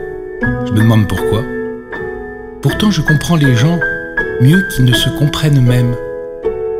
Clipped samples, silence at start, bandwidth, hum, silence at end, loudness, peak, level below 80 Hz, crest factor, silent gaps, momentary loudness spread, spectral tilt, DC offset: under 0.1%; 0 s; 16 kHz; none; 0 s; -13 LUFS; 0 dBFS; -30 dBFS; 12 dB; none; 13 LU; -6 dB/octave; under 0.1%